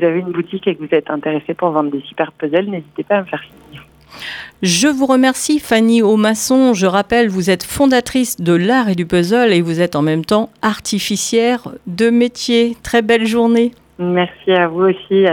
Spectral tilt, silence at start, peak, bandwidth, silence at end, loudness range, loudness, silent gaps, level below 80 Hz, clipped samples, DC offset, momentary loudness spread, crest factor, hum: -4.5 dB/octave; 0 s; 0 dBFS; 18.5 kHz; 0 s; 6 LU; -15 LUFS; none; -48 dBFS; under 0.1%; under 0.1%; 8 LU; 14 dB; none